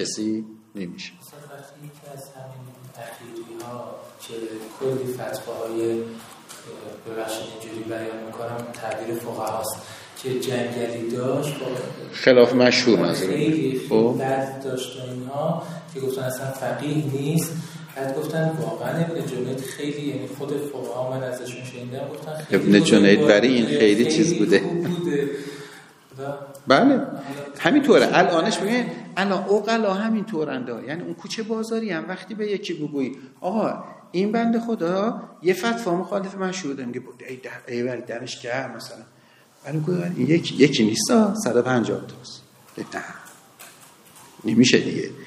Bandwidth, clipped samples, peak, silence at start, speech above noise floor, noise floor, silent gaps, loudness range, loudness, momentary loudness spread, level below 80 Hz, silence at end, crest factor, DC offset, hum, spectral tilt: 15.5 kHz; under 0.1%; 0 dBFS; 0 s; 31 dB; -54 dBFS; none; 12 LU; -22 LUFS; 21 LU; -70 dBFS; 0 s; 24 dB; under 0.1%; none; -5 dB/octave